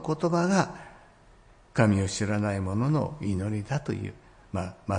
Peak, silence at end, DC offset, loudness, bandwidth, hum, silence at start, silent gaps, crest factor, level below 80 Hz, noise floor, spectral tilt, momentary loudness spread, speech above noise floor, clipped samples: -10 dBFS; 0 s; under 0.1%; -28 LUFS; 10.5 kHz; none; 0 s; none; 18 dB; -56 dBFS; -55 dBFS; -6.5 dB/octave; 11 LU; 29 dB; under 0.1%